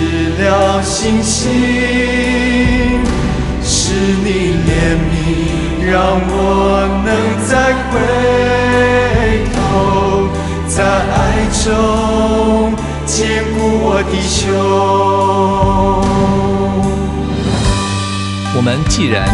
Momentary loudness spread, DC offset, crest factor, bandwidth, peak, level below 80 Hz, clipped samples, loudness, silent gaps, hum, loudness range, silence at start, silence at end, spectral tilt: 4 LU; under 0.1%; 12 dB; 11.5 kHz; 0 dBFS; -22 dBFS; under 0.1%; -13 LUFS; none; none; 1 LU; 0 s; 0 s; -5 dB/octave